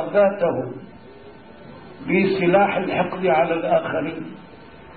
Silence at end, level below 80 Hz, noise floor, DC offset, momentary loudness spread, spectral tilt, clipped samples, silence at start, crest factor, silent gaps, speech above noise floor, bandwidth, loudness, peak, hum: 0 s; -56 dBFS; -43 dBFS; 0.3%; 20 LU; -11 dB/octave; under 0.1%; 0 s; 16 dB; none; 23 dB; 4.7 kHz; -20 LUFS; -6 dBFS; none